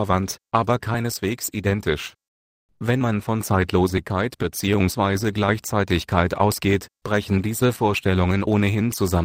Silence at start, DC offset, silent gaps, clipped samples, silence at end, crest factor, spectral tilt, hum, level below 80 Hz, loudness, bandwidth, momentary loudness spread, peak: 0 s; under 0.1%; 2.28-2.69 s; under 0.1%; 0 s; 20 dB; -5.5 dB/octave; none; -42 dBFS; -22 LUFS; 16 kHz; 5 LU; -2 dBFS